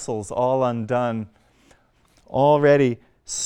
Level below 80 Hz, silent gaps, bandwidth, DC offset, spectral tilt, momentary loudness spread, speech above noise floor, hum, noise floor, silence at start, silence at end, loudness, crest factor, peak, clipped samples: -58 dBFS; none; 11 kHz; under 0.1%; -5.5 dB/octave; 15 LU; 39 dB; none; -59 dBFS; 0 s; 0 s; -21 LUFS; 16 dB; -6 dBFS; under 0.1%